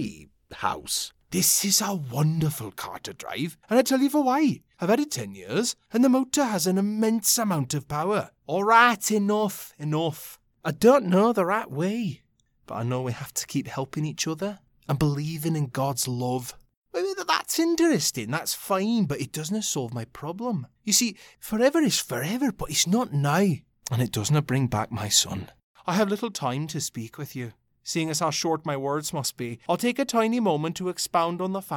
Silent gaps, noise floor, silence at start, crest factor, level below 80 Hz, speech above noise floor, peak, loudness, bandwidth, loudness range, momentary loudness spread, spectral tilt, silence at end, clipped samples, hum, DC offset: 16.77-16.82 s, 25.63-25.74 s; -46 dBFS; 0 s; 22 dB; -58 dBFS; 21 dB; -4 dBFS; -25 LUFS; 18 kHz; 6 LU; 13 LU; -4 dB/octave; 0 s; under 0.1%; none; under 0.1%